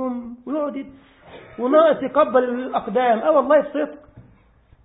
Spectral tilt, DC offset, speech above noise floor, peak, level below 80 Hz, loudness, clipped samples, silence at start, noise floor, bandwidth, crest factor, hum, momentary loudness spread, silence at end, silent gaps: -10 dB/octave; under 0.1%; 35 dB; -4 dBFS; -58 dBFS; -19 LUFS; under 0.1%; 0 s; -54 dBFS; 4 kHz; 18 dB; none; 15 LU; 0.65 s; none